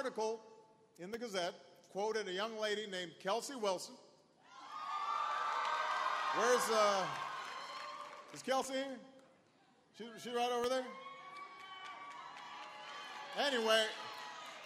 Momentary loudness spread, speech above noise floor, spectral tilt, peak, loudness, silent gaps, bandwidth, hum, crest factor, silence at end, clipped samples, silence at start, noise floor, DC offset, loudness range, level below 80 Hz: 18 LU; 32 dB; -2 dB/octave; -18 dBFS; -38 LUFS; none; 15 kHz; none; 22 dB; 0 s; under 0.1%; 0 s; -70 dBFS; under 0.1%; 7 LU; -86 dBFS